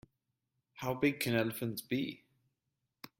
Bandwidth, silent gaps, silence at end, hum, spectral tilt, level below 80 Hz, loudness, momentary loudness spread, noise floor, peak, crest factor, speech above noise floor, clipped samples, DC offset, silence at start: 16.5 kHz; none; 0.1 s; none; -5 dB/octave; -70 dBFS; -35 LUFS; 14 LU; -86 dBFS; -18 dBFS; 20 dB; 51 dB; under 0.1%; under 0.1%; 0.75 s